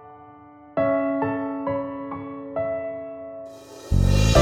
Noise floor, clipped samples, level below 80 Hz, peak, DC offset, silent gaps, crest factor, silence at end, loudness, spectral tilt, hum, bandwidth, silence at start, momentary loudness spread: -47 dBFS; under 0.1%; -30 dBFS; -4 dBFS; under 0.1%; none; 20 dB; 0 s; -25 LUFS; -6 dB/octave; none; 16 kHz; 0 s; 19 LU